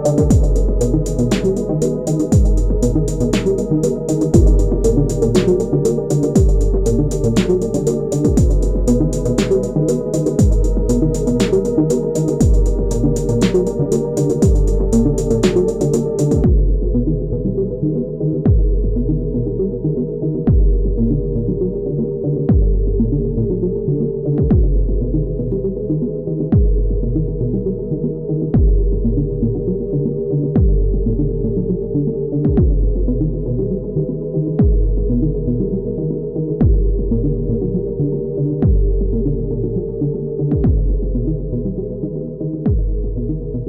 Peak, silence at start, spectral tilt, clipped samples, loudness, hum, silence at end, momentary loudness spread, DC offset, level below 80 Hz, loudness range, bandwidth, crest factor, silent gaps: 0 dBFS; 0 s; -8 dB/octave; under 0.1%; -17 LUFS; none; 0 s; 6 LU; 0.1%; -20 dBFS; 3 LU; 11 kHz; 16 dB; none